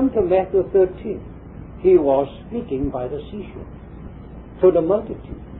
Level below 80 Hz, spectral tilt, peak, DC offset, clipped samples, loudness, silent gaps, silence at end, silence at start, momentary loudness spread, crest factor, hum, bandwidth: -40 dBFS; -12.5 dB/octave; -4 dBFS; under 0.1%; under 0.1%; -19 LUFS; none; 0 s; 0 s; 23 LU; 18 dB; none; 3.9 kHz